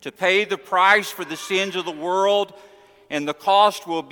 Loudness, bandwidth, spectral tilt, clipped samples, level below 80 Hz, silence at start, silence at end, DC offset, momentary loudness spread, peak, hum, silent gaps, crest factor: -20 LUFS; 19 kHz; -3 dB/octave; under 0.1%; -72 dBFS; 0.05 s; 0.05 s; under 0.1%; 13 LU; -2 dBFS; none; none; 18 dB